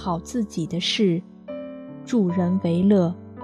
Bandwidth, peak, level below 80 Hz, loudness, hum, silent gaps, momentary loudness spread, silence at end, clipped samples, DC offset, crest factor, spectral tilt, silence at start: 11 kHz; -8 dBFS; -54 dBFS; -22 LUFS; none; none; 17 LU; 0 s; under 0.1%; under 0.1%; 16 dB; -6.5 dB/octave; 0 s